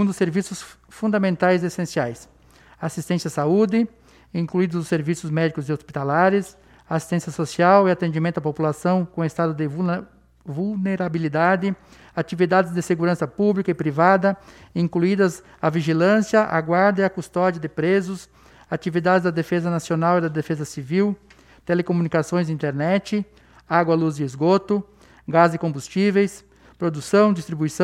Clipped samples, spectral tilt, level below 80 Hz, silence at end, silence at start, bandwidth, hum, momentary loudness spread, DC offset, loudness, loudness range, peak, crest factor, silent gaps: under 0.1%; -6.5 dB/octave; -58 dBFS; 0 s; 0 s; 13.5 kHz; none; 11 LU; under 0.1%; -21 LUFS; 4 LU; -2 dBFS; 20 dB; none